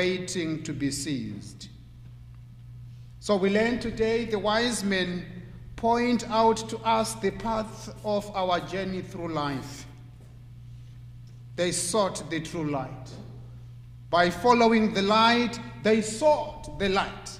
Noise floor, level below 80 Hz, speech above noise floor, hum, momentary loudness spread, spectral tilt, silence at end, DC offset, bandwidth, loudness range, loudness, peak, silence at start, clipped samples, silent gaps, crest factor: -46 dBFS; -50 dBFS; 20 dB; none; 24 LU; -4.5 dB/octave; 0 s; under 0.1%; 15.5 kHz; 9 LU; -26 LUFS; -8 dBFS; 0 s; under 0.1%; none; 20 dB